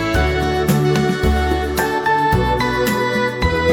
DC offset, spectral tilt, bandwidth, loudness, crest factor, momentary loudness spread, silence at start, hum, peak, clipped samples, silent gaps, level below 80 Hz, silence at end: under 0.1%; -5.5 dB/octave; 20 kHz; -17 LUFS; 14 dB; 3 LU; 0 s; none; -4 dBFS; under 0.1%; none; -26 dBFS; 0 s